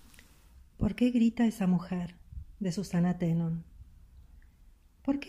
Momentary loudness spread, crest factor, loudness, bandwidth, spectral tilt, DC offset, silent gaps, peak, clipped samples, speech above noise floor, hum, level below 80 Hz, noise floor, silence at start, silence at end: 13 LU; 16 dB; -31 LUFS; 13.5 kHz; -7.5 dB/octave; under 0.1%; none; -16 dBFS; under 0.1%; 30 dB; none; -50 dBFS; -59 dBFS; 0.55 s; 0 s